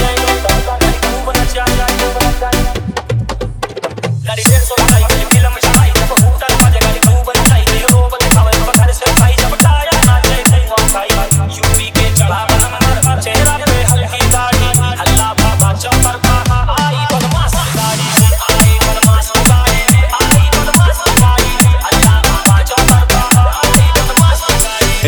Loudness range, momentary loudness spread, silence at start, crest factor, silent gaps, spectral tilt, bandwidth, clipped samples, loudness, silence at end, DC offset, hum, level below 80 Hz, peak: 4 LU; 5 LU; 0 s; 10 dB; none; -4 dB/octave; over 20 kHz; 0.4%; -10 LUFS; 0 s; under 0.1%; none; -16 dBFS; 0 dBFS